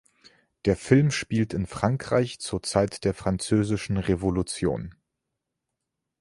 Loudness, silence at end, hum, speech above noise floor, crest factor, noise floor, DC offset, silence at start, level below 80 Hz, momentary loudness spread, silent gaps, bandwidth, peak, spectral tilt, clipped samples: -26 LUFS; 1.3 s; none; 59 dB; 22 dB; -83 dBFS; under 0.1%; 0.65 s; -46 dBFS; 8 LU; none; 11.5 kHz; -4 dBFS; -6 dB/octave; under 0.1%